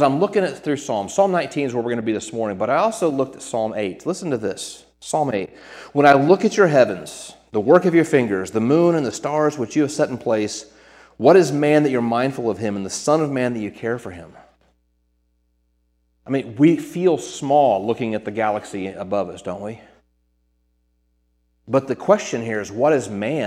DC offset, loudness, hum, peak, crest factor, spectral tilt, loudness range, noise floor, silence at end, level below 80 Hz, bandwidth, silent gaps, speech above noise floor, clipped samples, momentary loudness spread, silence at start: under 0.1%; -20 LUFS; none; 0 dBFS; 20 dB; -5.5 dB/octave; 9 LU; -66 dBFS; 0 s; -62 dBFS; 14.5 kHz; none; 47 dB; under 0.1%; 13 LU; 0 s